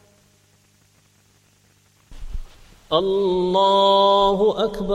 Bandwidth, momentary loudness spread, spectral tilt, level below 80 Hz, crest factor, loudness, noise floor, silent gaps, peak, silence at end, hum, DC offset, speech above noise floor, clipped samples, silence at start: 12.5 kHz; 24 LU; -6 dB/octave; -40 dBFS; 18 dB; -18 LUFS; -58 dBFS; none; -4 dBFS; 0 s; 50 Hz at -60 dBFS; under 0.1%; 41 dB; under 0.1%; 2.1 s